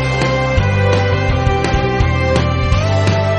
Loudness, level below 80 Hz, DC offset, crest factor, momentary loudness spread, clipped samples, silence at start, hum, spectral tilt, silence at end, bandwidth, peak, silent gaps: -15 LUFS; -24 dBFS; under 0.1%; 12 dB; 1 LU; under 0.1%; 0 s; none; -6.5 dB/octave; 0 s; 9.8 kHz; -2 dBFS; none